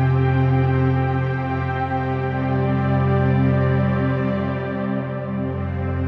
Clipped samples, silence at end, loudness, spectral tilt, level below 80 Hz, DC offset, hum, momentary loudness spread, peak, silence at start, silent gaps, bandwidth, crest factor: under 0.1%; 0 s; -21 LUFS; -10.5 dB/octave; -40 dBFS; under 0.1%; none; 7 LU; -8 dBFS; 0 s; none; 4.9 kHz; 12 dB